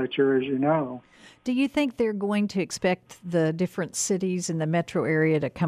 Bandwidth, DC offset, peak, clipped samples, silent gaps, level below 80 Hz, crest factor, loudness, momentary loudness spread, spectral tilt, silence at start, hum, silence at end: 14.5 kHz; under 0.1%; -10 dBFS; under 0.1%; none; -62 dBFS; 14 dB; -26 LUFS; 6 LU; -5.5 dB/octave; 0 s; none; 0 s